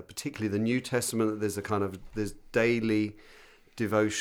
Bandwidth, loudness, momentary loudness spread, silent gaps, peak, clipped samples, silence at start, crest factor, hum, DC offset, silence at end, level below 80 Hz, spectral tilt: 17 kHz; -30 LUFS; 9 LU; none; -12 dBFS; under 0.1%; 0 s; 18 dB; none; under 0.1%; 0 s; -56 dBFS; -5 dB/octave